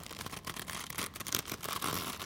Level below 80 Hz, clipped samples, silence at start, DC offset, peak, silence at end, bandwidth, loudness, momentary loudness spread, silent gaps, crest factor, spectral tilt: -60 dBFS; under 0.1%; 0 s; under 0.1%; -12 dBFS; 0 s; 17 kHz; -37 LUFS; 6 LU; none; 28 dB; -2 dB/octave